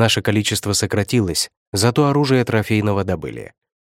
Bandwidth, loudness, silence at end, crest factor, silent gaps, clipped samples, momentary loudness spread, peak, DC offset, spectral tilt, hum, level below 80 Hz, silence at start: 16.5 kHz; -18 LUFS; 0.3 s; 18 dB; 1.57-1.72 s; under 0.1%; 8 LU; -2 dBFS; under 0.1%; -4.5 dB/octave; none; -46 dBFS; 0 s